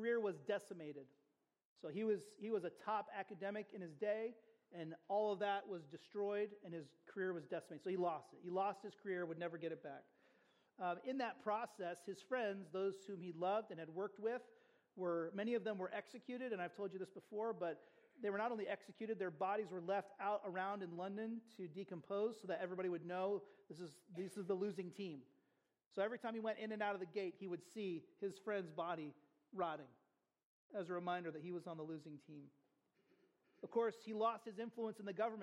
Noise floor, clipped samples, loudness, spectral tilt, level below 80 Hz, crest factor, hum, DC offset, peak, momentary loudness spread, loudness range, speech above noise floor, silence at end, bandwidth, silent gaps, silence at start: -84 dBFS; under 0.1%; -46 LUFS; -6.5 dB/octave; under -90 dBFS; 18 dB; none; under 0.1%; -28 dBFS; 11 LU; 3 LU; 39 dB; 0 s; 12.5 kHz; 1.65-1.76 s, 25.86-25.91 s, 30.43-30.70 s; 0 s